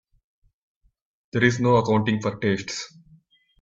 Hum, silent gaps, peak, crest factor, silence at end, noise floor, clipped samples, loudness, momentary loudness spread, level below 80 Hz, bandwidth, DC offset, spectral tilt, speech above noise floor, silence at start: none; none; -4 dBFS; 22 dB; 0.75 s; -57 dBFS; under 0.1%; -23 LUFS; 13 LU; -58 dBFS; 7.8 kHz; under 0.1%; -6 dB/octave; 36 dB; 1.35 s